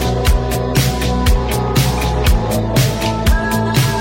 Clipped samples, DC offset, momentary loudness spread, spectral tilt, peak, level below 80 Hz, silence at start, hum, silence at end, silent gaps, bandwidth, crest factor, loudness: under 0.1%; under 0.1%; 2 LU; -5 dB/octave; -2 dBFS; -18 dBFS; 0 s; none; 0 s; none; 16.5 kHz; 12 dB; -16 LUFS